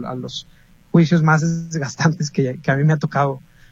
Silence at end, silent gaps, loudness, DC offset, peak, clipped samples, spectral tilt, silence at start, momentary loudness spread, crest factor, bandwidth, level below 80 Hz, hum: 0.3 s; none; -19 LUFS; under 0.1%; -2 dBFS; under 0.1%; -6.5 dB/octave; 0 s; 13 LU; 16 dB; 7.6 kHz; -54 dBFS; none